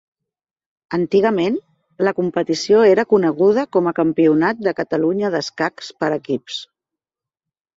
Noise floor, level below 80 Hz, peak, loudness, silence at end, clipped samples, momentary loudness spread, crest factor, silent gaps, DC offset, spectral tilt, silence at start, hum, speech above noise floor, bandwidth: -90 dBFS; -62 dBFS; -2 dBFS; -18 LUFS; 1.1 s; under 0.1%; 10 LU; 16 dB; none; under 0.1%; -6 dB/octave; 0.9 s; none; 73 dB; 7.8 kHz